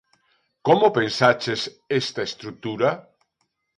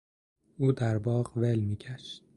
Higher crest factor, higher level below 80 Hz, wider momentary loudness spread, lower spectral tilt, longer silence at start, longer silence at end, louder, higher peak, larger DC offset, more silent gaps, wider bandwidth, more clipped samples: about the same, 20 dB vs 16 dB; second, -64 dBFS vs -58 dBFS; about the same, 13 LU vs 12 LU; second, -5 dB/octave vs -8 dB/octave; about the same, 0.65 s vs 0.6 s; first, 0.75 s vs 0.2 s; first, -22 LUFS vs -30 LUFS; first, -2 dBFS vs -14 dBFS; neither; neither; about the same, 11.5 kHz vs 11 kHz; neither